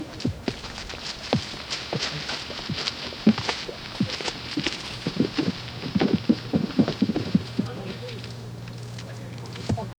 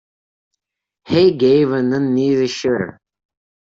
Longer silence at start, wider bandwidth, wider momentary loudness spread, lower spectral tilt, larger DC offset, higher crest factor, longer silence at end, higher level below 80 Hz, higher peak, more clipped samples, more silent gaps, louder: second, 0 s vs 1.05 s; first, 19 kHz vs 7.8 kHz; first, 13 LU vs 7 LU; about the same, -5.5 dB/octave vs -6.5 dB/octave; neither; first, 24 dB vs 14 dB; second, 0.05 s vs 0.8 s; first, -50 dBFS vs -56 dBFS; about the same, -4 dBFS vs -2 dBFS; neither; neither; second, -28 LUFS vs -16 LUFS